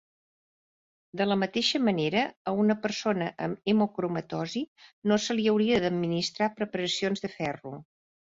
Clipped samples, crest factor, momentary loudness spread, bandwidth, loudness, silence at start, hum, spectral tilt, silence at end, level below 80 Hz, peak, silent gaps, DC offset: under 0.1%; 16 dB; 9 LU; 7.8 kHz; -28 LUFS; 1.15 s; none; -5 dB/octave; 0.45 s; -66 dBFS; -12 dBFS; 2.36-2.45 s, 4.68-4.76 s, 4.93-5.02 s; under 0.1%